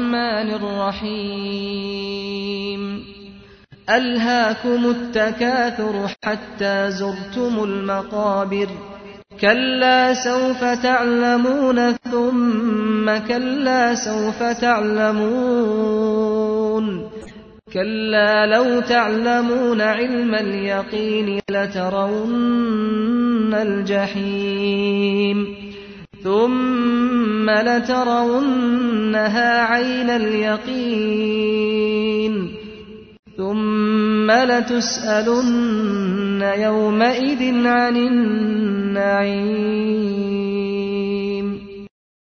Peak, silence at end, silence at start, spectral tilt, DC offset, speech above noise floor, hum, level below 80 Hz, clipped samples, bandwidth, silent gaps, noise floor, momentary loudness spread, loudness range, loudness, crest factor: -2 dBFS; 0.5 s; 0 s; -5 dB/octave; under 0.1%; 27 dB; none; -54 dBFS; under 0.1%; 6.6 kHz; 33.19-33.23 s; -45 dBFS; 9 LU; 4 LU; -19 LUFS; 18 dB